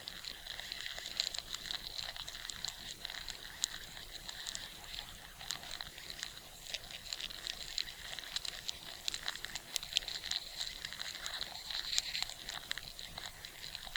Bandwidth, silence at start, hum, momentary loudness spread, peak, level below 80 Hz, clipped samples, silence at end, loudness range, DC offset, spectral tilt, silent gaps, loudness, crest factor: over 20 kHz; 0 s; none; 9 LU; -8 dBFS; -60 dBFS; under 0.1%; 0 s; 5 LU; under 0.1%; 0.5 dB/octave; none; -41 LUFS; 36 dB